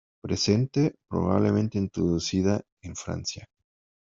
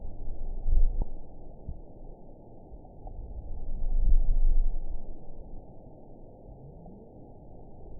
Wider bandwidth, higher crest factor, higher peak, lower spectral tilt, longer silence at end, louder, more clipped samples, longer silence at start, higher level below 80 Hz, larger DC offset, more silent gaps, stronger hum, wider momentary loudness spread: first, 7.8 kHz vs 1 kHz; about the same, 20 dB vs 16 dB; about the same, -8 dBFS vs -10 dBFS; second, -6 dB/octave vs -15 dB/octave; first, 0.65 s vs 0 s; first, -26 LUFS vs -36 LUFS; neither; first, 0.25 s vs 0 s; second, -56 dBFS vs -28 dBFS; second, under 0.1% vs 0.1%; first, 2.72-2.77 s vs none; neither; second, 11 LU vs 20 LU